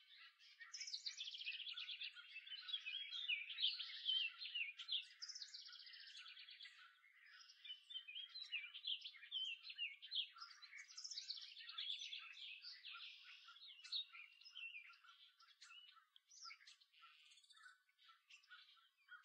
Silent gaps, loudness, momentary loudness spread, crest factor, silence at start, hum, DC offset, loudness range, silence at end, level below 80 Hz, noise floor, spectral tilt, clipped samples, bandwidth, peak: none; -49 LUFS; 21 LU; 24 dB; 0 s; none; under 0.1%; 15 LU; 0 s; under -90 dBFS; -74 dBFS; 8 dB/octave; under 0.1%; 9.4 kHz; -30 dBFS